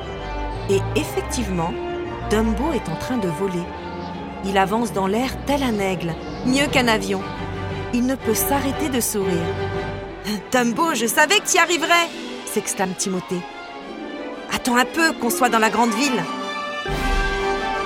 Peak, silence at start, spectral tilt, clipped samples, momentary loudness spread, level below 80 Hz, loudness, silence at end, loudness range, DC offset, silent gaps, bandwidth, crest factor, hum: -4 dBFS; 0 s; -3.5 dB/octave; under 0.1%; 12 LU; -36 dBFS; -21 LUFS; 0 s; 4 LU; under 0.1%; none; 16.5 kHz; 18 dB; none